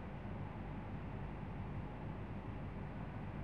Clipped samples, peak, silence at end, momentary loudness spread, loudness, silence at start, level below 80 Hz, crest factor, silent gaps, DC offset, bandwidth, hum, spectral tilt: under 0.1%; -34 dBFS; 0 s; 1 LU; -47 LUFS; 0 s; -52 dBFS; 12 dB; none; 0.1%; 6.4 kHz; none; -9 dB/octave